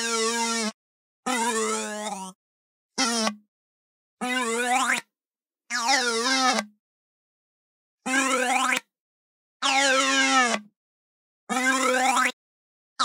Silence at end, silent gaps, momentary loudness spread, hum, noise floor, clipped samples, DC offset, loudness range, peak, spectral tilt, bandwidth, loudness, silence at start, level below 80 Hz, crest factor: 0 s; 0.74-1.23 s, 2.35-2.90 s, 3.48-4.17 s, 5.27-5.31 s, 6.79-7.98 s, 9.00-9.60 s, 10.76-11.47 s, 12.33-12.96 s; 12 LU; none; under -90 dBFS; under 0.1%; under 0.1%; 6 LU; -6 dBFS; -0.5 dB/octave; 16 kHz; -23 LUFS; 0 s; -86 dBFS; 20 dB